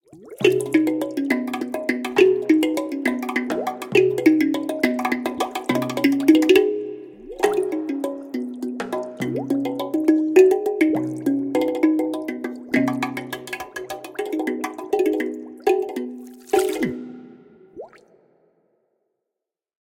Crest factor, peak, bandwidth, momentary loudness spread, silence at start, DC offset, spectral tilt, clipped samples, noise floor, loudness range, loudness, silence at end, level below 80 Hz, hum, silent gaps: 20 dB; -2 dBFS; 17 kHz; 15 LU; 0.15 s; under 0.1%; -5 dB/octave; under 0.1%; -85 dBFS; 6 LU; -21 LUFS; 2.1 s; -64 dBFS; none; none